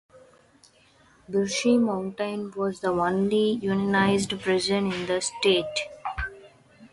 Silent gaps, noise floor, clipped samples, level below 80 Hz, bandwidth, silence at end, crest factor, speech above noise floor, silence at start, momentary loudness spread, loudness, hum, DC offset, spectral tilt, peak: none; -58 dBFS; under 0.1%; -52 dBFS; 11.5 kHz; 0.05 s; 16 dB; 34 dB; 1.3 s; 9 LU; -25 LUFS; none; under 0.1%; -4.5 dB/octave; -10 dBFS